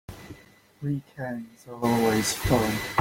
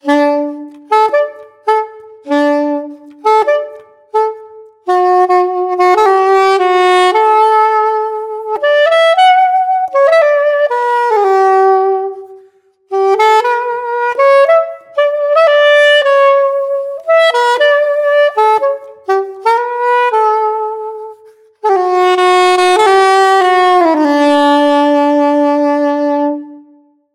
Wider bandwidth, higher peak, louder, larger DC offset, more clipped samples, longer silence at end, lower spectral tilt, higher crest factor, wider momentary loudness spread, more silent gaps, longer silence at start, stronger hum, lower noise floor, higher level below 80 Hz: first, 17 kHz vs 14 kHz; second, -8 dBFS vs 0 dBFS; second, -26 LUFS vs -11 LUFS; neither; neither; second, 0 s vs 0.55 s; first, -4.5 dB/octave vs -2 dB/octave; first, 20 dB vs 10 dB; first, 20 LU vs 11 LU; neither; about the same, 0.1 s vs 0.05 s; neither; first, -53 dBFS vs -47 dBFS; first, -46 dBFS vs -66 dBFS